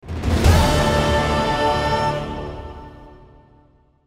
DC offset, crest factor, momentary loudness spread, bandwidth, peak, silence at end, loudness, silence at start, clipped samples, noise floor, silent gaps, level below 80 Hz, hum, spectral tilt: under 0.1%; 18 dB; 18 LU; 16 kHz; -2 dBFS; 0.9 s; -18 LUFS; 0.05 s; under 0.1%; -55 dBFS; none; -28 dBFS; none; -5.5 dB/octave